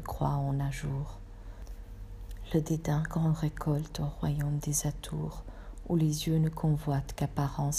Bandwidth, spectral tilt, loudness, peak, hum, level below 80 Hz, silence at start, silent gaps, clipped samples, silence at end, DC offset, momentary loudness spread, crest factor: 15.5 kHz; -6 dB/octave; -32 LUFS; -14 dBFS; none; -44 dBFS; 0 s; none; under 0.1%; 0 s; under 0.1%; 18 LU; 16 dB